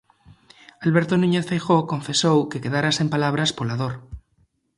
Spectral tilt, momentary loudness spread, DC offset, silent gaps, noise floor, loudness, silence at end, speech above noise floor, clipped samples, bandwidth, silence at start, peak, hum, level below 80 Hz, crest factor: -5 dB/octave; 7 LU; under 0.1%; none; -65 dBFS; -21 LUFS; 0.6 s; 44 dB; under 0.1%; 11.5 kHz; 0.8 s; -4 dBFS; none; -52 dBFS; 18 dB